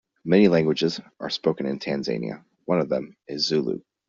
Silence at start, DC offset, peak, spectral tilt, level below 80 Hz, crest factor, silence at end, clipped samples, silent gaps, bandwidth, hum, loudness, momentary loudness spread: 0.25 s; under 0.1%; -6 dBFS; -5 dB/octave; -62 dBFS; 20 dB; 0.3 s; under 0.1%; none; 7.6 kHz; none; -24 LUFS; 13 LU